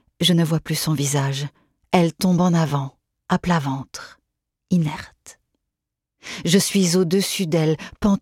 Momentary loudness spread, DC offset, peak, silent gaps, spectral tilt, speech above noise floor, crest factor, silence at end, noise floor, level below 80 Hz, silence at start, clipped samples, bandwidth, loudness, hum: 16 LU; under 0.1%; -2 dBFS; none; -5 dB/octave; 63 dB; 18 dB; 0.05 s; -83 dBFS; -50 dBFS; 0.2 s; under 0.1%; 16.5 kHz; -20 LUFS; none